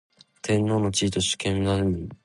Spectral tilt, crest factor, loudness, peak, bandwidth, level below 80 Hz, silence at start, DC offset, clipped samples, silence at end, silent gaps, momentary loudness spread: -4.5 dB/octave; 14 dB; -24 LUFS; -10 dBFS; 11.5 kHz; -44 dBFS; 0.45 s; under 0.1%; under 0.1%; 0.1 s; none; 4 LU